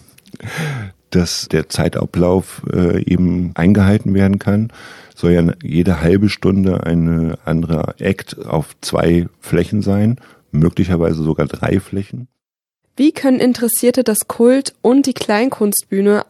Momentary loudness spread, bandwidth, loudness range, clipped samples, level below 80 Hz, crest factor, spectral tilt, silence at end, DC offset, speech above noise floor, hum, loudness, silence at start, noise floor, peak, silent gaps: 9 LU; 15 kHz; 3 LU; under 0.1%; -38 dBFS; 14 dB; -6 dB/octave; 0.05 s; under 0.1%; 60 dB; none; -16 LUFS; 0.4 s; -75 dBFS; -2 dBFS; none